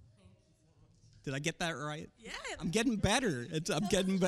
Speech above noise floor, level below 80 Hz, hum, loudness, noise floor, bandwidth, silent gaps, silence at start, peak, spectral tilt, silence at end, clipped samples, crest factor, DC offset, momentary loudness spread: 33 dB; -56 dBFS; none; -35 LUFS; -67 dBFS; 14.5 kHz; none; 0.25 s; -14 dBFS; -4.5 dB/octave; 0 s; under 0.1%; 20 dB; under 0.1%; 13 LU